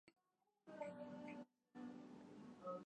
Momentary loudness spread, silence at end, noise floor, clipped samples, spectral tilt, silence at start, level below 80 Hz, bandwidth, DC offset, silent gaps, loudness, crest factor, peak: 7 LU; 0.05 s; -88 dBFS; under 0.1%; -7 dB/octave; 0.05 s; under -90 dBFS; 9.6 kHz; under 0.1%; none; -56 LUFS; 16 dB; -40 dBFS